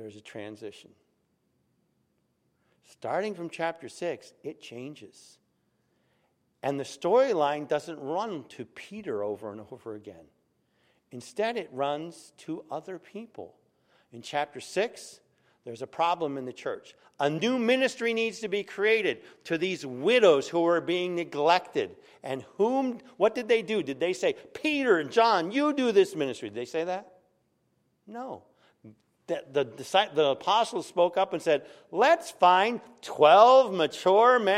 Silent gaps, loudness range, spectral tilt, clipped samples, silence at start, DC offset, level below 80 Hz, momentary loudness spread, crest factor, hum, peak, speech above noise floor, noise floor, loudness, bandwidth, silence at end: none; 12 LU; -4.5 dB/octave; under 0.1%; 0 s; under 0.1%; -80 dBFS; 20 LU; 22 dB; none; -6 dBFS; 46 dB; -74 dBFS; -26 LUFS; 14 kHz; 0 s